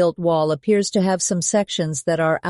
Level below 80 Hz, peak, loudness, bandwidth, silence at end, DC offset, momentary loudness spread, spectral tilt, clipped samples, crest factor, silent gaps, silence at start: -62 dBFS; -6 dBFS; -20 LUFS; 11.5 kHz; 0 s; under 0.1%; 3 LU; -4.5 dB/octave; under 0.1%; 12 dB; none; 0 s